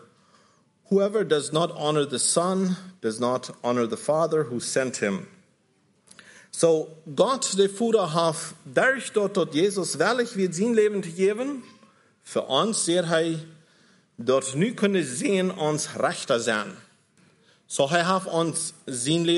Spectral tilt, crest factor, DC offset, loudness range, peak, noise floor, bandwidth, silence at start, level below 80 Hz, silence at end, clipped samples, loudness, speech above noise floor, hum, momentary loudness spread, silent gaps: -4 dB/octave; 18 dB; under 0.1%; 3 LU; -6 dBFS; -65 dBFS; 11.5 kHz; 0.9 s; -76 dBFS; 0 s; under 0.1%; -24 LUFS; 41 dB; none; 8 LU; none